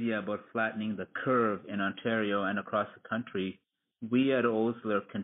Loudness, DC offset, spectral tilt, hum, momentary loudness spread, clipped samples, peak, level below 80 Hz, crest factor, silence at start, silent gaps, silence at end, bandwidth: -31 LUFS; under 0.1%; -10 dB/octave; none; 8 LU; under 0.1%; -16 dBFS; -70 dBFS; 16 dB; 0 s; none; 0 s; 3.9 kHz